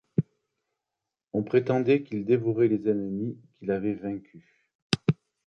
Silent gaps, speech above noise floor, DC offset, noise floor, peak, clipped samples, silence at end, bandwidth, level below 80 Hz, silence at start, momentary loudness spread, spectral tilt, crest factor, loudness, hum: 4.75-4.90 s; 61 dB; under 0.1%; -87 dBFS; -2 dBFS; under 0.1%; 0.35 s; 10.5 kHz; -62 dBFS; 0.2 s; 12 LU; -7 dB/octave; 26 dB; -27 LUFS; none